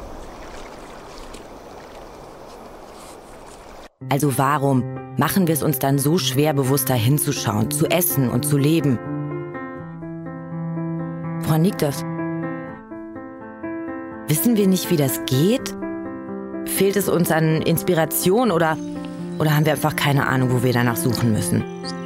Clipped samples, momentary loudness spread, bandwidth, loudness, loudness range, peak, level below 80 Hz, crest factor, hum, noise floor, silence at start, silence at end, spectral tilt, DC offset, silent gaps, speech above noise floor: under 0.1%; 21 LU; 16.5 kHz; -20 LUFS; 6 LU; -2 dBFS; -50 dBFS; 18 dB; none; -41 dBFS; 0 s; 0 s; -5.5 dB/octave; under 0.1%; none; 22 dB